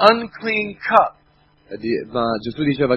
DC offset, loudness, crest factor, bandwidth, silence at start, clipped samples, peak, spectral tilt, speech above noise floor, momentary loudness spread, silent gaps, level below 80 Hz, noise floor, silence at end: under 0.1%; -20 LUFS; 20 dB; 9.2 kHz; 0 s; under 0.1%; 0 dBFS; -7 dB/octave; 38 dB; 8 LU; none; -52 dBFS; -56 dBFS; 0 s